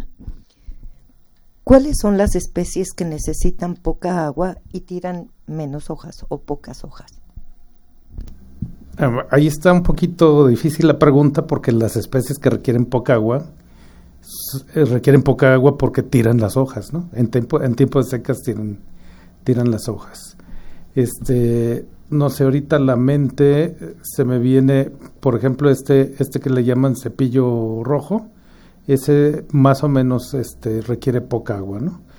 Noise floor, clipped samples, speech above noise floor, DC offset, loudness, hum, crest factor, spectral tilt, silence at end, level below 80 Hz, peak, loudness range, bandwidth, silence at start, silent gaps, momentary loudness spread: -48 dBFS; under 0.1%; 32 dB; under 0.1%; -17 LUFS; none; 18 dB; -7.5 dB/octave; 0.2 s; -32 dBFS; 0 dBFS; 10 LU; over 20 kHz; 0 s; none; 16 LU